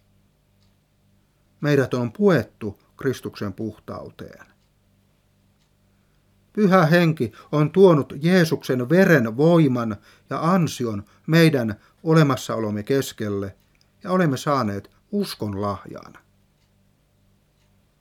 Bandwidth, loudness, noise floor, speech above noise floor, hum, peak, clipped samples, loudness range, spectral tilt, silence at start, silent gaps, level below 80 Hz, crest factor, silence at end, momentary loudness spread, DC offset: 15.5 kHz; -21 LUFS; -62 dBFS; 42 dB; 50 Hz at -50 dBFS; -2 dBFS; under 0.1%; 14 LU; -7 dB/octave; 1.6 s; none; -62 dBFS; 20 dB; 2 s; 19 LU; under 0.1%